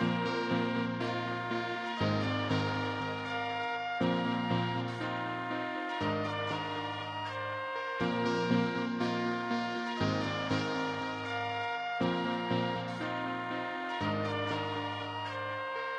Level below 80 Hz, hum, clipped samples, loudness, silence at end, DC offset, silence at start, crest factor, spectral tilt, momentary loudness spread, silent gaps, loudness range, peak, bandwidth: -66 dBFS; none; under 0.1%; -34 LUFS; 0 s; under 0.1%; 0 s; 18 dB; -6 dB/octave; 5 LU; none; 2 LU; -16 dBFS; 9.8 kHz